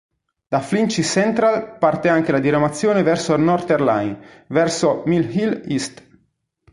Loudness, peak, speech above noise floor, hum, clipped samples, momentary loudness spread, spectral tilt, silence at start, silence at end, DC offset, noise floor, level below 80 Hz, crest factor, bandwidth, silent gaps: -18 LUFS; -2 dBFS; 48 dB; none; under 0.1%; 7 LU; -5.5 dB/octave; 0.5 s; 0.85 s; under 0.1%; -66 dBFS; -54 dBFS; 16 dB; 11.5 kHz; none